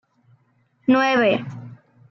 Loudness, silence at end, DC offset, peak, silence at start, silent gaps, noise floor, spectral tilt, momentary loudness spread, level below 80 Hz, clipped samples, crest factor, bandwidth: -19 LUFS; 0.35 s; under 0.1%; -6 dBFS; 0.9 s; none; -63 dBFS; -6 dB/octave; 19 LU; -70 dBFS; under 0.1%; 16 dB; 6.2 kHz